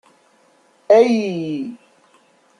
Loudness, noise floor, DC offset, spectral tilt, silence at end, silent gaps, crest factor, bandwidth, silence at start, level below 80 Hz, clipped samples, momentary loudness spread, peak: -17 LUFS; -56 dBFS; under 0.1%; -6.5 dB/octave; 0.85 s; none; 18 dB; 10 kHz; 0.9 s; -72 dBFS; under 0.1%; 15 LU; -2 dBFS